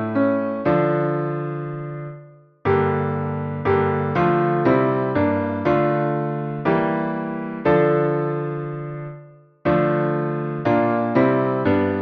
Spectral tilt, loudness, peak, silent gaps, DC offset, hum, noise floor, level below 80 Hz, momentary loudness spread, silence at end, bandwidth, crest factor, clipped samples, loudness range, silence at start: -10 dB/octave; -21 LUFS; -6 dBFS; none; under 0.1%; none; -45 dBFS; -54 dBFS; 10 LU; 0 s; 5.8 kHz; 16 dB; under 0.1%; 3 LU; 0 s